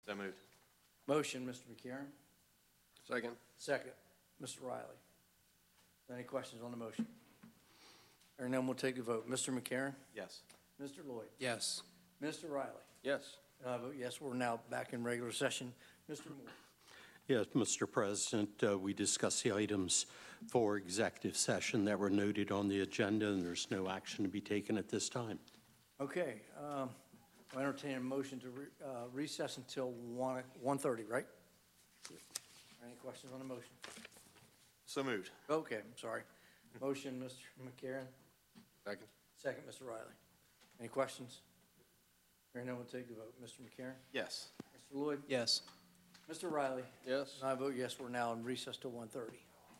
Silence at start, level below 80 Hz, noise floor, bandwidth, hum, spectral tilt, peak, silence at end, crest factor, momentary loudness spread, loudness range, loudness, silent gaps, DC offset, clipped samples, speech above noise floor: 0.05 s; -86 dBFS; -74 dBFS; 16 kHz; none; -3.5 dB/octave; -20 dBFS; 0 s; 24 dB; 18 LU; 12 LU; -41 LUFS; none; under 0.1%; under 0.1%; 32 dB